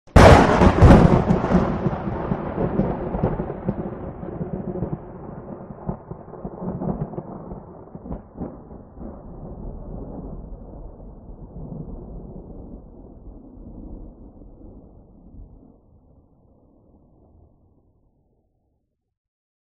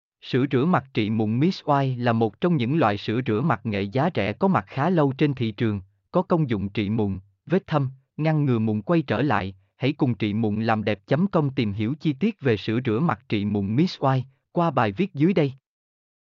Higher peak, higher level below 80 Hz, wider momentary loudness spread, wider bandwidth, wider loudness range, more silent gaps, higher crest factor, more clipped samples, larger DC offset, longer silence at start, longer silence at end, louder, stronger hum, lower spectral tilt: first, 0 dBFS vs -8 dBFS; first, -30 dBFS vs -62 dBFS; first, 28 LU vs 5 LU; first, 10.5 kHz vs 7 kHz; first, 25 LU vs 2 LU; neither; first, 22 dB vs 16 dB; neither; neither; about the same, 0.15 s vs 0.25 s; first, 4.3 s vs 0.8 s; first, -19 LUFS vs -24 LUFS; neither; second, -7.5 dB/octave vs -9 dB/octave